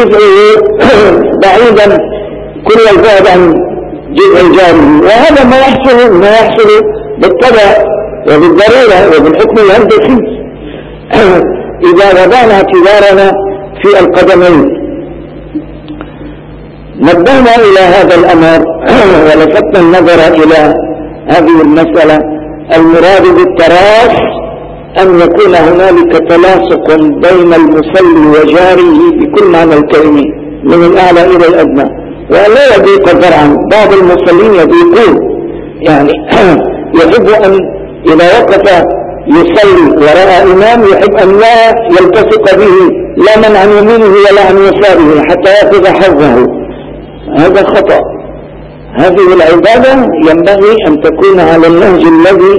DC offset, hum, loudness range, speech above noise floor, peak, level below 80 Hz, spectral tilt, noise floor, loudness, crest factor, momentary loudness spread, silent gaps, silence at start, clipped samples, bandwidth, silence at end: under 0.1%; none; 3 LU; 23 dB; 0 dBFS; -30 dBFS; -6 dB/octave; -25 dBFS; -4 LUFS; 4 dB; 11 LU; none; 0 s; 20%; 11 kHz; 0 s